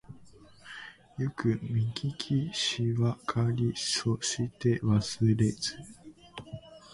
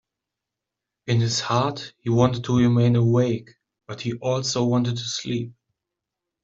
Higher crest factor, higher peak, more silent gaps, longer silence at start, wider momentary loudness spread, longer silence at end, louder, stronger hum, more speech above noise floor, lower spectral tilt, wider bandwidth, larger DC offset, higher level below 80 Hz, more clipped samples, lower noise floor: about the same, 18 dB vs 20 dB; second, -14 dBFS vs -4 dBFS; neither; second, 0.1 s vs 1.05 s; first, 19 LU vs 13 LU; second, 0 s vs 0.95 s; second, -30 LUFS vs -22 LUFS; neither; second, 25 dB vs 64 dB; about the same, -5 dB/octave vs -6 dB/octave; first, 11.5 kHz vs 7.8 kHz; neither; about the same, -56 dBFS vs -56 dBFS; neither; second, -54 dBFS vs -85 dBFS